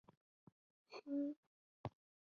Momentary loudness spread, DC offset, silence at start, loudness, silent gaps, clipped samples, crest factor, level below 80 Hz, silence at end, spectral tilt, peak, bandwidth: 14 LU; under 0.1%; 0.9 s; -48 LUFS; 1.36-1.84 s; under 0.1%; 20 dB; -78 dBFS; 0.45 s; -7 dB/octave; -30 dBFS; 6.6 kHz